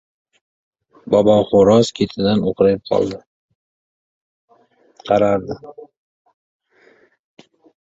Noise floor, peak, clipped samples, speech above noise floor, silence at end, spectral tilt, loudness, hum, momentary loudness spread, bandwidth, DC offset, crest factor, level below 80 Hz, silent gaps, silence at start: -55 dBFS; 0 dBFS; under 0.1%; 40 dB; 2.1 s; -6.5 dB/octave; -16 LUFS; none; 17 LU; 7.8 kHz; under 0.1%; 18 dB; -50 dBFS; 3.27-3.49 s, 3.55-4.48 s; 1.05 s